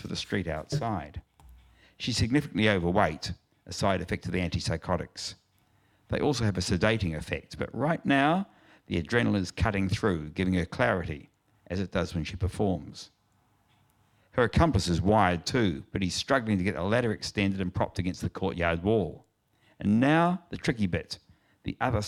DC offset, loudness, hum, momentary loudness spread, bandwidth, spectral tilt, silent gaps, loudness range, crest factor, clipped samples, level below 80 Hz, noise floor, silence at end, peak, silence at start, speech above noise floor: under 0.1%; -28 LUFS; none; 13 LU; 14 kHz; -6 dB/octave; none; 4 LU; 22 dB; under 0.1%; -48 dBFS; -68 dBFS; 0 s; -8 dBFS; 0 s; 40 dB